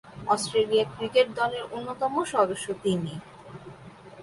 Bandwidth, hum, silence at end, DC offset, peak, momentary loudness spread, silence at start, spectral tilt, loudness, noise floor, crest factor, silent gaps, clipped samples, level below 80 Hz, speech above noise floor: 11.5 kHz; none; 0 s; under 0.1%; -8 dBFS; 21 LU; 0.05 s; -4.5 dB/octave; -26 LUFS; -47 dBFS; 18 dB; none; under 0.1%; -62 dBFS; 21 dB